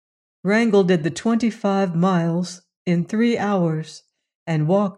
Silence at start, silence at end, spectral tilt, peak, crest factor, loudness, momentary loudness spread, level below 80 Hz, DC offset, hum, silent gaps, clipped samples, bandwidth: 0.45 s; 0.05 s; -7 dB/octave; -6 dBFS; 14 dB; -20 LUFS; 12 LU; -66 dBFS; under 0.1%; none; 2.76-2.85 s, 4.35-4.46 s; under 0.1%; 10.5 kHz